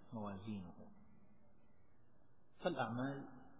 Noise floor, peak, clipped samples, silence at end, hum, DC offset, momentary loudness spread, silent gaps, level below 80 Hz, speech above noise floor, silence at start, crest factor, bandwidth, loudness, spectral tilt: -73 dBFS; -24 dBFS; under 0.1%; 0 s; none; 0.1%; 17 LU; none; -74 dBFS; 29 dB; 0 s; 24 dB; 4 kHz; -45 LUFS; -5.5 dB/octave